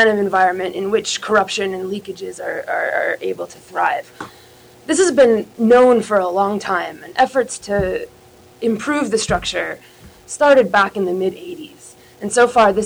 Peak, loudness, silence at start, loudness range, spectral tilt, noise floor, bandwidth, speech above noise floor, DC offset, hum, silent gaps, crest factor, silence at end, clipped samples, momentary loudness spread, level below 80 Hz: -4 dBFS; -17 LUFS; 0 s; 5 LU; -4 dB/octave; -43 dBFS; over 20 kHz; 26 dB; under 0.1%; none; none; 14 dB; 0 s; under 0.1%; 18 LU; -46 dBFS